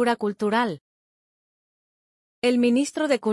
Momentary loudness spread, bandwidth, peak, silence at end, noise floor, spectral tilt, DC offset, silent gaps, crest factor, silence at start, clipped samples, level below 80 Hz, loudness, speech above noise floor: 7 LU; 12 kHz; -10 dBFS; 0 s; under -90 dBFS; -4.5 dB/octave; under 0.1%; 0.81-2.42 s; 16 dB; 0 s; under 0.1%; -72 dBFS; -23 LUFS; over 68 dB